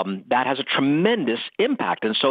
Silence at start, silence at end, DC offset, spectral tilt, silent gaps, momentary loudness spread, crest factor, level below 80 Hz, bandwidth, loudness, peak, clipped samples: 0 s; 0 s; under 0.1%; -8 dB/octave; none; 4 LU; 16 dB; -78 dBFS; 5 kHz; -22 LUFS; -6 dBFS; under 0.1%